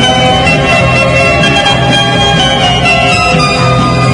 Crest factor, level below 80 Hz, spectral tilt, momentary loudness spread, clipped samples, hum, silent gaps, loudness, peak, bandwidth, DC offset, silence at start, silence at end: 8 dB; -24 dBFS; -4.5 dB/octave; 1 LU; 0.9%; none; none; -7 LUFS; 0 dBFS; 11.5 kHz; under 0.1%; 0 s; 0 s